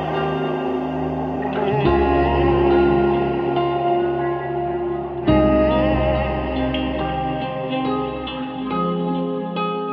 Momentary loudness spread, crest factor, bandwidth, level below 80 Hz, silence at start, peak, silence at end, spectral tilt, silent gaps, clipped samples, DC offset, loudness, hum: 8 LU; 16 dB; 5.4 kHz; -32 dBFS; 0 s; -4 dBFS; 0 s; -9.5 dB/octave; none; under 0.1%; under 0.1%; -20 LUFS; none